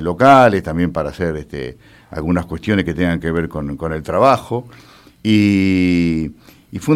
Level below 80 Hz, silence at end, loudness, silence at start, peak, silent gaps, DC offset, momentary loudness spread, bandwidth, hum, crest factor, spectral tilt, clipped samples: -42 dBFS; 0 s; -16 LUFS; 0 s; 0 dBFS; none; under 0.1%; 16 LU; 14.5 kHz; none; 16 dB; -7 dB/octave; under 0.1%